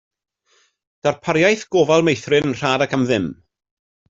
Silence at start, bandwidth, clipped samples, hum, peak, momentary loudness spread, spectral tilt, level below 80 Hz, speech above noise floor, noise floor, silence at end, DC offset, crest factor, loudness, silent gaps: 1.05 s; 7.8 kHz; under 0.1%; none; -2 dBFS; 7 LU; -5 dB/octave; -56 dBFS; 44 dB; -61 dBFS; 0.75 s; under 0.1%; 18 dB; -18 LUFS; none